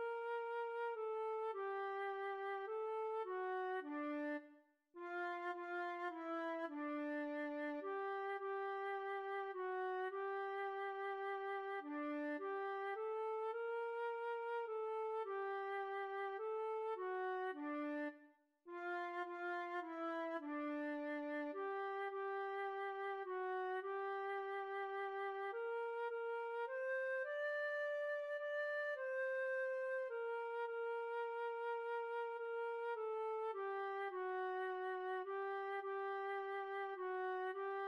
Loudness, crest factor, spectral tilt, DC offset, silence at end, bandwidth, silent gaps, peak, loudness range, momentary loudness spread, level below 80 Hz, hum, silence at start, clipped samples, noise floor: -44 LUFS; 10 dB; -3.5 dB/octave; under 0.1%; 0 s; 10 kHz; none; -34 dBFS; 3 LU; 3 LU; under -90 dBFS; none; 0 s; under 0.1%; -69 dBFS